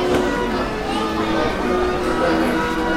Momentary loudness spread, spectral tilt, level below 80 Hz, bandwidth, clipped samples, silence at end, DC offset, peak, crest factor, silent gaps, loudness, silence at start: 4 LU; -5.5 dB/octave; -34 dBFS; 16 kHz; under 0.1%; 0 s; under 0.1%; -4 dBFS; 14 dB; none; -20 LUFS; 0 s